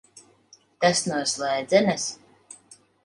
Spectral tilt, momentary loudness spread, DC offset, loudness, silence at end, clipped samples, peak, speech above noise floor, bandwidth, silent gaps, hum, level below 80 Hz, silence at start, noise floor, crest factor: -3 dB/octave; 24 LU; under 0.1%; -23 LUFS; 0.9 s; under 0.1%; -6 dBFS; 35 dB; 11.5 kHz; none; none; -68 dBFS; 0.8 s; -57 dBFS; 22 dB